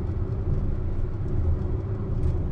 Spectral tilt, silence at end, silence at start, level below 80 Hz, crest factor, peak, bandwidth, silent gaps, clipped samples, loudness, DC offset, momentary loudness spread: -10.5 dB/octave; 0 s; 0 s; -28 dBFS; 12 dB; -14 dBFS; 3.5 kHz; none; under 0.1%; -29 LUFS; under 0.1%; 3 LU